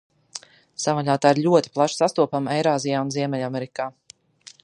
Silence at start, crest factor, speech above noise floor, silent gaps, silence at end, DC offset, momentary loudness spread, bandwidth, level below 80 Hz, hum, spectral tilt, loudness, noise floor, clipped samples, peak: 0.35 s; 20 dB; 29 dB; none; 0.75 s; under 0.1%; 19 LU; 11.5 kHz; -70 dBFS; none; -5 dB/octave; -22 LUFS; -50 dBFS; under 0.1%; -2 dBFS